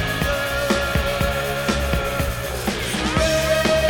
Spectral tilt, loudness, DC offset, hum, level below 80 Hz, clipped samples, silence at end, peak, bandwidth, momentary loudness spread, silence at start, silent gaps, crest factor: -4 dB/octave; -21 LUFS; under 0.1%; none; -30 dBFS; under 0.1%; 0 s; -4 dBFS; 19.5 kHz; 6 LU; 0 s; none; 16 dB